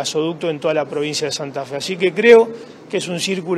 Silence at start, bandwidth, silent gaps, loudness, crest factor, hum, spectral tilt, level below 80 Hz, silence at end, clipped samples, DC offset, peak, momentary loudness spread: 0 s; 13 kHz; none; -18 LUFS; 18 dB; none; -4 dB/octave; -66 dBFS; 0 s; under 0.1%; under 0.1%; 0 dBFS; 14 LU